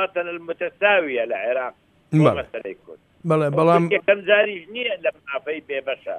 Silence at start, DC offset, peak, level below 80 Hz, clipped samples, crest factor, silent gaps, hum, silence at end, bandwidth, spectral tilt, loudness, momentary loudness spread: 0 s; under 0.1%; -4 dBFS; -60 dBFS; under 0.1%; 18 dB; none; none; 0 s; 10 kHz; -7 dB/octave; -21 LUFS; 14 LU